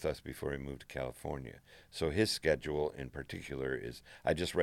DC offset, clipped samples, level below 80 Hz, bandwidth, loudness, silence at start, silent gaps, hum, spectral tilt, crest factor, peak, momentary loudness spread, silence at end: under 0.1%; under 0.1%; -54 dBFS; 16.5 kHz; -37 LUFS; 0 s; none; none; -5 dB/octave; 22 dB; -16 dBFS; 13 LU; 0 s